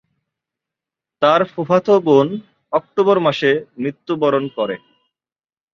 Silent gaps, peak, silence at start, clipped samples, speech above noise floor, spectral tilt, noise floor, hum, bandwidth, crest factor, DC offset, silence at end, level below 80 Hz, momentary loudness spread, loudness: none; -2 dBFS; 1.2 s; under 0.1%; over 74 dB; -7 dB/octave; under -90 dBFS; none; 7 kHz; 16 dB; under 0.1%; 1 s; -64 dBFS; 10 LU; -17 LUFS